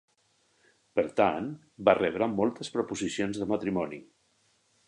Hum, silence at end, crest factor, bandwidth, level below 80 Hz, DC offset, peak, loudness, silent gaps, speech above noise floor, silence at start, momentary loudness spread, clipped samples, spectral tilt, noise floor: none; 0.85 s; 24 dB; 11 kHz; -64 dBFS; under 0.1%; -8 dBFS; -29 LUFS; none; 41 dB; 0.95 s; 10 LU; under 0.1%; -5.5 dB/octave; -70 dBFS